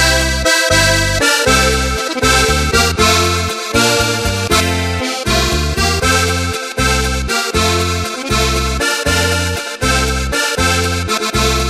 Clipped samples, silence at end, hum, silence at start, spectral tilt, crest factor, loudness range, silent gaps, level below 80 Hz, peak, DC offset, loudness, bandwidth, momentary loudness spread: under 0.1%; 0 s; none; 0 s; -3 dB/octave; 14 dB; 3 LU; none; -24 dBFS; 0 dBFS; under 0.1%; -13 LUFS; 16 kHz; 6 LU